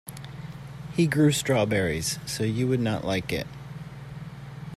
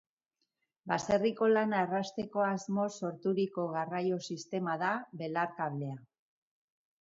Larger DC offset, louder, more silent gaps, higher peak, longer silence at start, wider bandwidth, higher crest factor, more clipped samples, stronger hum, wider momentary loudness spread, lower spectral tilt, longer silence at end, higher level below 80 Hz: neither; first, -25 LUFS vs -33 LUFS; neither; first, -10 dBFS vs -14 dBFS; second, 0.05 s vs 0.85 s; first, 15 kHz vs 7.8 kHz; about the same, 18 dB vs 20 dB; neither; neither; first, 18 LU vs 9 LU; about the same, -5 dB/octave vs -6 dB/octave; second, 0 s vs 0.95 s; first, -52 dBFS vs -74 dBFS